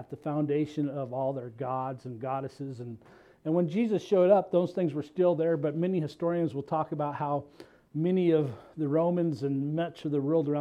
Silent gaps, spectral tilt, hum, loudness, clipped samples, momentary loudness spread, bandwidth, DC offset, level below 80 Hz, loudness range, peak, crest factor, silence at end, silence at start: none; -9 dB/octave; none; -29 LUFS; under 0.1%; 11 LU; 9.4 kHz; under 0.1%; -72 dBFS; 6 LU; -10 dBFS; 18 dB; 0 s; 0 s